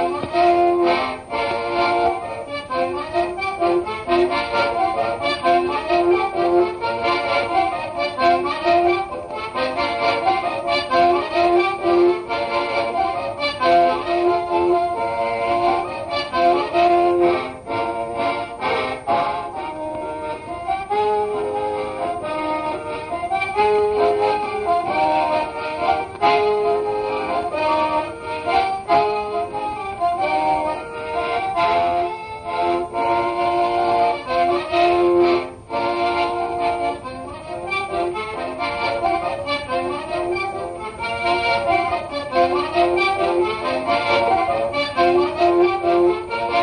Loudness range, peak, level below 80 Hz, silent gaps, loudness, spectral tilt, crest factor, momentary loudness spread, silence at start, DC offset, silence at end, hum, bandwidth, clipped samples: 5 LU; -4 dBFS; -50 dBFS; none; -20 LUFS; -5.5 dB/octave; 16 dB; 9 LU; 0 s; under 0.1%; 0 s; none; 9.4 kHz; under 0.1%